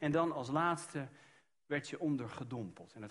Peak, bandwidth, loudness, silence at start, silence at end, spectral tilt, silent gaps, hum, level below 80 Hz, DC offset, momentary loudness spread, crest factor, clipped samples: -20 dBFS; 11.5 kHz; -38 LUFS; 0 s; 0 s; -6 dB/octave; none; none; -74 dBFS; under 0.1%; 13 LU; 18 dB; under 0.1%